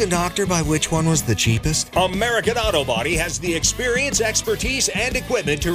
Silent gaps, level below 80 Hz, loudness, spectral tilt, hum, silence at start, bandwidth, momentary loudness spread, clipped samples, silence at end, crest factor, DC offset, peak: none; -34 dBFS; -19 LUFS; -3.5 dB/octave; none; 0 s; 16 kHz; 3 LU; under 0.1%; 0 s; 16 dB; under 0.1%; -4 dBFS